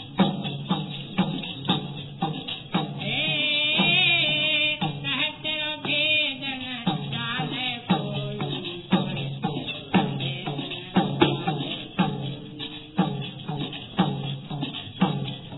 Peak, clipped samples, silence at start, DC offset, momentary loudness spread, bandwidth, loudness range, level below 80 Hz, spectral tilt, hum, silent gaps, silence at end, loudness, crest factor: -4 dBFS; under 0.1%; 0 s; under 0.1%; 12 LU; 4.1 kHz; 7 LU; -58 dBFS; -8 dB/octave; none; none; 0 s; -25 LUFS; 22 dB